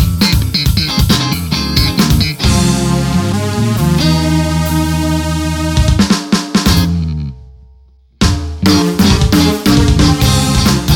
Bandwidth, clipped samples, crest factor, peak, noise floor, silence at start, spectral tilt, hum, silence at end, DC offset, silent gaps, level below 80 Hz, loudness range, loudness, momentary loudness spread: 19.5 kHz; under 0.1%; 12 dB; 0 dBFS; -44 dBFS; 0 s; -5 dB/octave; none; 0 s; under 0.1%; none; -20 dBFS; 2 LU; -12 LUFS; 5 LU